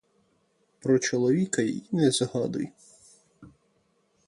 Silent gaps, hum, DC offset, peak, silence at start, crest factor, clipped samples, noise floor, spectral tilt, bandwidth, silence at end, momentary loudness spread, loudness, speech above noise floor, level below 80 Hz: none; none; under 0.1%; -10 dBFS; 0.85 s; 18 dB; under 0.1%; -69 dBFS; -5 dB/octave; 11.5 kHz; 0.8 s; 10 LU; -26 LUFS; 44 dB; -68 dBFS